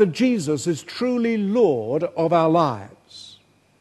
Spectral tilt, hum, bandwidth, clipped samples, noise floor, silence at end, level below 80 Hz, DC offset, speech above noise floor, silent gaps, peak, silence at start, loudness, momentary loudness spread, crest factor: -6 dB/octave; none; 12.5 kHz; under 0.1%; -53 dBFS; 0.5 s; -66 dBFS; under 0.1%; 33 dB; none; -4 dBFS; 0 s; -21 LUFS; 22 LU; 18 dB